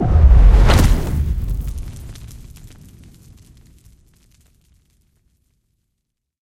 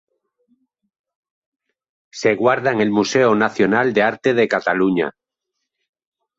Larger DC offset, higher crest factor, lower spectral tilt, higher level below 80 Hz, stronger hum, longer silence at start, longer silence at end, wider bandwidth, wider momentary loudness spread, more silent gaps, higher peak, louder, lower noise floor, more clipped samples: neither; about the same, 16 dB vs 18 dB; about the same, -6.5 dB/octave vs -5.5 dB/octave; first, -18 dBFS vs -60 dBFS; neither; second, 0 s vs 2.15 s; first, 4.15 s vs 1.3 s; first, 15.5 kHz vs 7.8 kHz; first, 26 LU vs 5 LU; neither; about the same, 0 dBFS vs -2 dBFS; about the same, -15 LUFS vs -17 LUFS; about the same, -76 dBFS vs -79 dBFS; neither